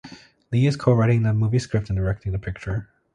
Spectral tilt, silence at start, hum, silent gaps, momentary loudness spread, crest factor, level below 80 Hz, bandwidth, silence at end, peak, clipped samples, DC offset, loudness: -8 dB/octave; 0.05 s; none; none; 11 LU; 18 dB; -40 dBFS; 9.8 kHz; 0.3 s; -4 dBFS; under 0.1%; under 0.1%; -23 LUFS